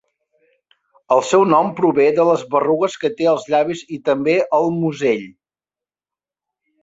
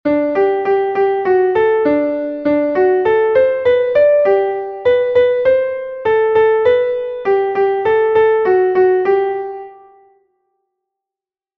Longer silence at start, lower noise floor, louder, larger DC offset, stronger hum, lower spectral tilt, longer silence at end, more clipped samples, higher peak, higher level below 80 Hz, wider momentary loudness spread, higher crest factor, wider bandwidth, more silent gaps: first, 1.1 s vs 0.05 s; about the same, under -90 dBFS vs -89 dBFS; second, -17 LUFS vs -14 LUFS; neither; neither; second, -6 dB/octave vs -7.5 dB/octave; second, 1.5 s vs 1.85 s; neither; about the same, -2 dBFS vs -2 dBFS; second, -64 dBFS vs -52 dBFS; about the same, 6 LU vs 7 LU; about the same, 16 dB vs 12 dB; first, 8 kHz vs 5.2 kHz; neither